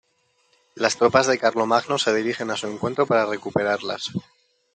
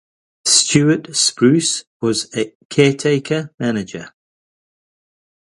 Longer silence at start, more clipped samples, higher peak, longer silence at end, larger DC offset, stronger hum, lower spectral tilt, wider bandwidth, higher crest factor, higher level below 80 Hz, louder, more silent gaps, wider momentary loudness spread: first, 0.75 s vs 0.45 s; neither; about the same, -2 dBFS vs 0 dBFS; second, 0.55 s vs 1.35 s; neither; neither; about the same, -4 dB/octave vs -3.5 dB/octave; second, 9.4 kHz vs 11.5 kHz; about the same, 20 dB vs 18 dB; second, -64 dBFS vs -56 dBFS; second, -22 LUFS vs -16 LUFS; second, none vs 1.87-2.00 s, 2.55-2.70 s, 3.54-3.58 s; about the same, 10 LU vs 11 LU